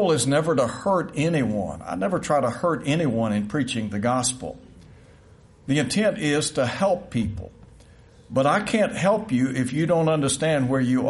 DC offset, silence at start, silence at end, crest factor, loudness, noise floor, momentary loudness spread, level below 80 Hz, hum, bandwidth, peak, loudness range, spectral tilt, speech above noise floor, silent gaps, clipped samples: under 0.1%; 0 s; 0 s; 14 dB; -23 LUFS; -51 dBFS; 7 LU; -52 dBFS; none; 11.5 kHz; -8 dBFS; 3 LU; -5 dB/octave; 28 dB; none; under 0.1%